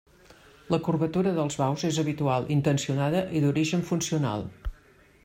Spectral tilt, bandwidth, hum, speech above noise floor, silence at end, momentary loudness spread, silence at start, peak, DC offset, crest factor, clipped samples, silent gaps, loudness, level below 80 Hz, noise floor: -6 dB/octave; 16 kHz; none; 31 dB; 0.55 s; 5 LU; 0.7 s; -12 dBFS; under 0.1%; 16 dB; under 0.1%; none; -27 LUFS; -48 dBFS; -57 dBFS